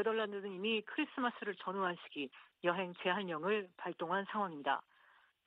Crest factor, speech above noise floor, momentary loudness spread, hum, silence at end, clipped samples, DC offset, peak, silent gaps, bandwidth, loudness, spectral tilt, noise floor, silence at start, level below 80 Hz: 20 dB; 30 dB; 7 LU; none; 0.65 s; under 0.1%; under 0.1%; -20 dBFS; none; 5 kHz; -39 LUFS; -7.5 dB/octave; -69 dBFS; 0 s; -88 dBFS